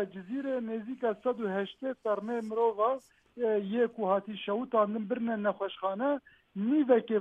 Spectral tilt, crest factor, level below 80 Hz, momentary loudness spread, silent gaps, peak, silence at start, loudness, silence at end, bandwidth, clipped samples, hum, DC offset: -8 dB/octave; 18 dB; -78 dBFS; 8 LU; none; -14 dBFS; 0 s; -31 LUFS; 0 s; 8.4 kHz; under 0.1%; none; under 0.1%